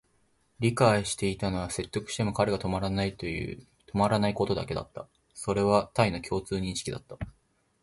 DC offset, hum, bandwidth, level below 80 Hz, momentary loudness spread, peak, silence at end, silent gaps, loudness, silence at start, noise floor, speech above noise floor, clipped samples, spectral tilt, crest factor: under 0.1%; none; 11.5 kHz; -50 dBFS; 15 LU; -8 dBFS; 0.55 s; none; -29 LUFS; 0.6 s; -69 dBFS; 40 dB; under 0.1%; -5.5 dB/octave; 22 dB